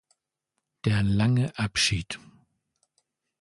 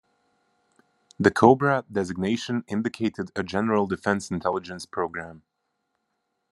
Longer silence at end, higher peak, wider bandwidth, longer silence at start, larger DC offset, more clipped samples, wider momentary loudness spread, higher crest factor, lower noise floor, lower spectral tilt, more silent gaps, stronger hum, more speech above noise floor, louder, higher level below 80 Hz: about the same, 1.25 s vs 1.15 s; second, -10 dBFS vs -2 dBFS; about the same, 11.5 kHz vs 12 kHz; second, 0.85 s vs 1.2 s; neither; neither; about the same, 11 LU vs 13 LU; second, 18 dB vs 24 dB; first, -82 dBFS vs -77 dBFS; second, -4.5 dB/octave vs -6 dB/octave; neither; neither; first, 58 dB vs 53 dB; about the same, -25 LUFS vs -25 LUFS; first, -48 dBFS vs -64 dBFS